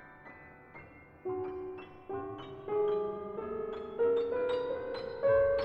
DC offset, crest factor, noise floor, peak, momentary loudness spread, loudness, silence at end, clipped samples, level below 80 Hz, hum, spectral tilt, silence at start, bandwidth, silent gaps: under 0.1%; 16 dB; -53 dBFS; -18 dBFS; 22 LU; -34 LUFS; 0 s; under 0.1%; -62 dBFS; none; -7.5 dB/octave; 0 s; 5.4 kHz; none